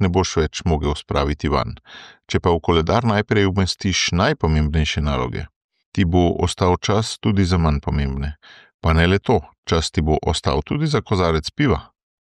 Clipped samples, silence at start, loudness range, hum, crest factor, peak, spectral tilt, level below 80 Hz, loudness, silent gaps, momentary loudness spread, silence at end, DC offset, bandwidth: under 0.1%; 0 s; 2 LU; none; 16 dB; -4 dBFS; -5.5 dB/octave; -30 dBFS; -20 LUFS; 5.56-5.69 s, 5.86-5.92 s, 8.74-8.79 s, 9.58-9.63 s; 8 LU; 0.4 s; under 0.1%; 10.5 kHz